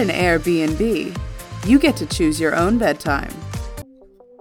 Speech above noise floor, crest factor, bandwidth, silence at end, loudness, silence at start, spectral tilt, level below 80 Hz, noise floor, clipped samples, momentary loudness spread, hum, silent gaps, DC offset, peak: 29 dB; 16 dB; 18.5 kHz; 0.6 s; -19 LUFS; 0 s; -5.5 dB/octave; -34 dBFS; -47 dBFS; under 0.1%; 16 LU; none; none; under 0.1%; -2 dBFS